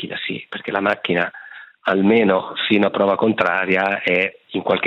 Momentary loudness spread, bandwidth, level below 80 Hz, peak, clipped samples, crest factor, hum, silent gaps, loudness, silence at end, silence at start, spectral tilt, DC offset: 10 LU; 6.8 kHz; -66 dBFS; -2 dBFS; under 0.1%; 16 dB; none; none; -19 LUFS; 0 s; 0 s; -7.5 dB/octave; under 0.1%